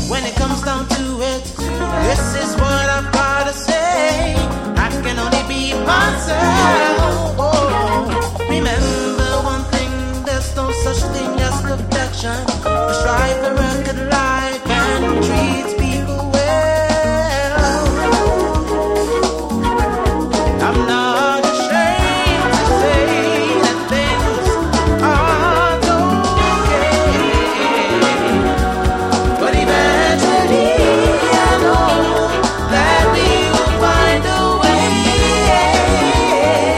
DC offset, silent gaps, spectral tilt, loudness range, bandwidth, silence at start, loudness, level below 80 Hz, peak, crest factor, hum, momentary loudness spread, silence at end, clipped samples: under 0.1%; none; -4.5 dB/octave; 5 LU; 16 kHz; 0 s; -15 LUFS; -24 dBFS; 0 dBFS; 14 dB; none; 6 LU; 0 s; under 0.1%